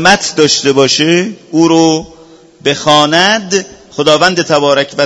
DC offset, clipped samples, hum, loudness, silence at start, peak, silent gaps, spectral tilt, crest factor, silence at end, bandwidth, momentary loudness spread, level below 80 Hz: under 0.1%; 0.7%; none; -10 LUFS; 0 s; 0 dBFS; none; -3.5 dB/octave; 10 dB; 0 s; 11 kHz; 8 LU; -48 dBFS